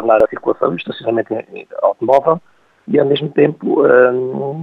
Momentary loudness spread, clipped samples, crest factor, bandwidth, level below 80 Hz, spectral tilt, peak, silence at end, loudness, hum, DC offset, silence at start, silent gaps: 10 LU; under 0.1%; 14 dB; 5.4 kHz; -58 dBFS; -8 dB/octave; 0 dBFS; 0 s; -15 LUFS; none; under 0.1%; 0 s; none